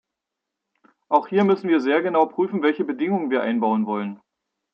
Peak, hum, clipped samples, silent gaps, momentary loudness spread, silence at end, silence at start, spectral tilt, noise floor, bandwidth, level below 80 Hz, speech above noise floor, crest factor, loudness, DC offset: -4 dBFS; none; under 0.1%; none; 5 LU; 0.55 s; 1.1 s; -8 dB/octave; -84 dBFS; 6.6 kHz; -76 dBFS; 63 dB; 18 dB; -21 LUFS; under 0.1%